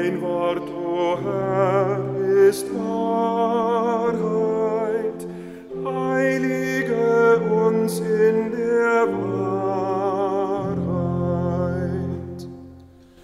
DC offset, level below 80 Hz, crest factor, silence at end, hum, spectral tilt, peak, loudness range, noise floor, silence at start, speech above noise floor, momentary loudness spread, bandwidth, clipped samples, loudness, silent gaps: under 0.1%; -52 dBFS; 14 dB; 0.4 s; none; -7 dB/octave; -6 dBFS; 4 LU; -46 dBFS; 0 s; 25 dB; 10 LU; 14 kHz; under 0.1%; -21 LUFS; none